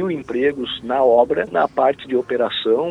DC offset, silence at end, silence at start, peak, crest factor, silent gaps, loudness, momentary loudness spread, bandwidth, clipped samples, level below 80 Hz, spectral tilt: under 0.1%; 0 s; 0 s; -2 dBFS; 16 dB; none; -19 LUFS; 8 LU; 9 kHz; under 0.1%; -54 dBFS; -6.5 dB/octave